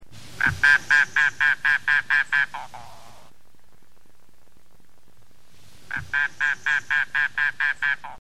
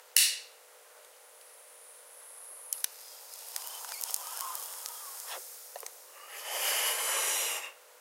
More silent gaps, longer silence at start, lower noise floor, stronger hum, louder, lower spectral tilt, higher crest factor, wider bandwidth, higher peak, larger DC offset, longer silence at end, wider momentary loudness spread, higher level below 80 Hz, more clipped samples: neither; about the same, 0 s vs 0 s; first, -60 dBFS vs -56 dBFS; neither; first, -21 LUFS vs -32 LUFS; first, -1.5 dB/octave vs 4.5 dB/octave; second, 20 dB vs 36 dB; second, 14 kHz vs 17 kHz; second, -6 dBFS vs 0 dBFS; first, 1% vs under 0.1%; about the same, 0.05 s vs 0 s; second, 10 LU vs 23 LU; first, -56 dBFS vs -90 dBFS; neither